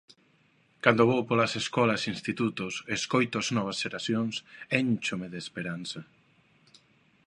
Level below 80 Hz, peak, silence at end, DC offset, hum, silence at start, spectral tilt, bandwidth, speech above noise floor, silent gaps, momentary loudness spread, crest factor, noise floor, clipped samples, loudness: -68 dBFS; -4 dBFS; 1.25 s; under 0.1%; none; 0.85 s; -4.5 dB/octave; 11 kHz; 37 dB; none; 12 LU; 26 dB; -65 dBFS; under 0.1%; -28 LUFS